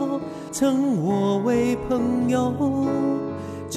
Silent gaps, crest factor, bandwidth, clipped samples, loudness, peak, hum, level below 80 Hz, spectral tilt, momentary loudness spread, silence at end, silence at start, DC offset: none; 12 dB; 14 kHz; under 0.1%; -23 LUFS; -10 dBFS; none; -52 dBFS; -6.5 dB/octave; 8 LU; 0 s; 0 s; under 0.1%